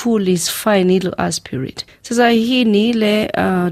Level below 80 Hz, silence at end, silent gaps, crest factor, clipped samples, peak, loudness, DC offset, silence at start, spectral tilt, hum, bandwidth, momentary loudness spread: -50 dBFS; 0 s; none; 14 dB; under 0.1%; -2 dBFS; -15 LUFS; under 0.1%; 0 s; -5 dB/octave; none; 15.5 kHz; 11 LU